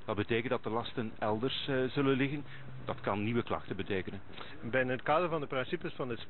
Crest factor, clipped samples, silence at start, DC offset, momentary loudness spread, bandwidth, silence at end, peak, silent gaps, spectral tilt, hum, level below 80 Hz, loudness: 18 dB; under 0.1%; 0 s; 0.6%; 12 LU; 4.4 kHz; 0 s; -16 dBFS; none; -4.5 dB/octave; none; -62 dBFS; -34 LUFS